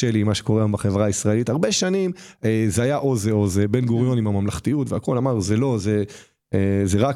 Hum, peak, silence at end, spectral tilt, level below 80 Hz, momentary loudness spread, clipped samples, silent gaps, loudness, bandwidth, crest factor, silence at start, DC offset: none; -6 dBFS; 0 s; -6 dB/octave; -48 dBFS; 4 LU; under 0.1%; none; -21 LUFS; 14 kHz; 14 dB; 0 s; under 0.1%